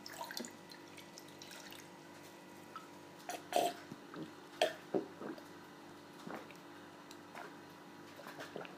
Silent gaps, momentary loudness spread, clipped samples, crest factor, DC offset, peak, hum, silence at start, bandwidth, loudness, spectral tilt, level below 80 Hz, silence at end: none; 17 LU; under 0.1%; 28 dB; under 0.1%; -18 dBFS; none; 0 s; 15.5 kHz; -46 LUFS; -3 dB/octave; -88 dBFS; 0 s